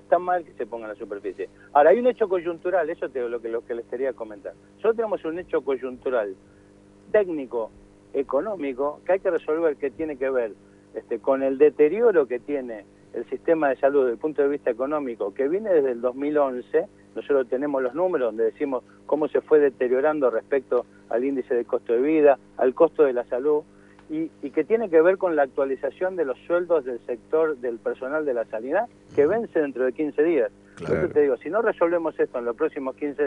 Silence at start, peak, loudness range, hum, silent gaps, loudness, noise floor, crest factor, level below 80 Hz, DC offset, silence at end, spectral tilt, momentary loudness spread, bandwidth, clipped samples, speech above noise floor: 0.1 s; -4 dBFS; 5 LU; 50 Hz at -60 dBFS; none; -24 LUFS; -52 dBFS; 18 dB; -62 dBFS; under 0.1%; 0 s; -8 dB/octave; 12 LU; 3.9 kHz; under 0.1%; 29 dB